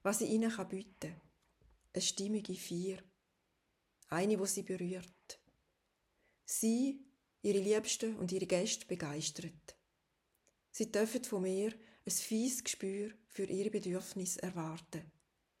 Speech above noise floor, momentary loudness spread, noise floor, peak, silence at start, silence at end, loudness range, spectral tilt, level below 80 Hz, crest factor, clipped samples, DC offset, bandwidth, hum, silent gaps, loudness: 44 dB; 15 LU; -82 dBFS; -20 dBFS; 0.05 s; 0.5 s; 5 LU; -4 dB/octave; -76 dBFS; 20 dB; under 0.1%; under 0.1%; 16 kHz; none; none; -38 LUFS